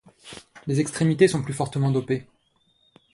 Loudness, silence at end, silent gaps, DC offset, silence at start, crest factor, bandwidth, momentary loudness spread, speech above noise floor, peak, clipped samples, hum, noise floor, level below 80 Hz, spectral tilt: -23 LUFS; 0.9 s; none; under 0.1%; 0.25 s; 20 dB; 11.5 kHz; 22 LU; 43 dB; -6 dBFS; under 0.1%; none; -66 dBFS; -58 dBFS; -6.5 dB/octave